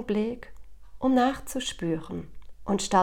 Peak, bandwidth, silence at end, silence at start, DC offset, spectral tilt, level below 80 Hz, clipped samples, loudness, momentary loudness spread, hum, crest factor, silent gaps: -10 dBFS; 17 kHz; 0 s; 0 s; under 0.1%; -4.5 dB/octave; -48 dBFS; under 0.1%; -28 LUFS; 17 LU; none; 18 dB; none